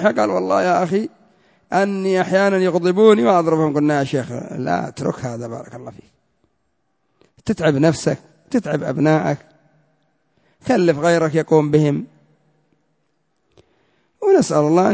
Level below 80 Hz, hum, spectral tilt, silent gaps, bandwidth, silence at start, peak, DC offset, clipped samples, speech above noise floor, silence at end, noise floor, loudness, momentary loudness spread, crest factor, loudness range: -56 dBFS; none; -6.5 dB/octave; none; 8 kHz; 0 s; -2 dBFS; under 0.1%; under 0.1%; 53 dB; 0 s; -70 dBFS; -18 LUFS; 14 LU; 18 dB; 7 LU